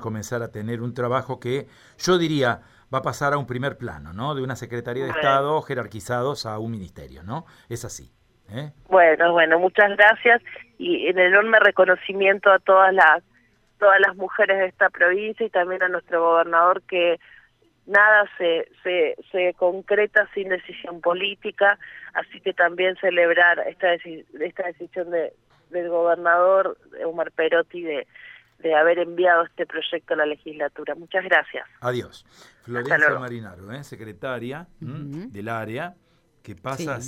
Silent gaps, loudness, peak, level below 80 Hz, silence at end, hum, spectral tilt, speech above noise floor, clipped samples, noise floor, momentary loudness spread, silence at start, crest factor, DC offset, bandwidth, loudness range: none; -20 LUFS; -2 dBFS; -60 dBFS; 0 s; none; -5 dB/octave; 39 dB; under 0.1%; -61 dBFS; 18 LU; 0 s; 18 dB; under 0.1%; 14.5 kHz; 9 LU